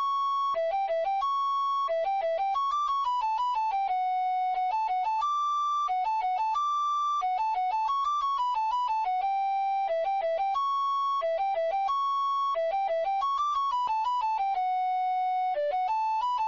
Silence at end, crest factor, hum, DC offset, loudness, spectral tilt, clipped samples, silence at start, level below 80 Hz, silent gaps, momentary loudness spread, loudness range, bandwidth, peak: 0 s; 6 dB; none; under 0.1%; -28 LUFS; 3.5 dB/octave; under 0.1%; 0 s; -66 dBFS; none; 1 LU; 0 LU; 7.4 kHz; -22 dBFS